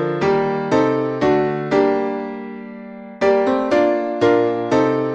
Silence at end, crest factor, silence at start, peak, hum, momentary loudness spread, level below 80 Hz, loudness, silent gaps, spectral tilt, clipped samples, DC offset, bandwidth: 0 s; 14 dB; 0 s; -4 dBFS; none; 15 LU; -52 dBFS; -18 LUFS; none; -7 dB/octave; under 0.1%; under 0.1%; 8.2 kHz